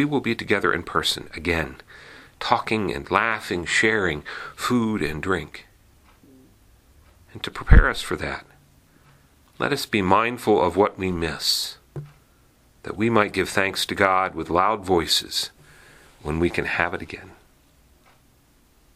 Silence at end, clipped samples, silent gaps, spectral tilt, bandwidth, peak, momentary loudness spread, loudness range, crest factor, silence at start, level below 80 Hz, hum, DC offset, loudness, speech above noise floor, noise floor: 1.6 s; under 0.1%; none; -4.5 dB/octave; 15.5 kHz; 0 dBFS; 16 LU; 5 LU; 24 dB; 0 s; -32 dBFS; none; under 0.1%; -22 LUFS; 36 dB; -58 dBFS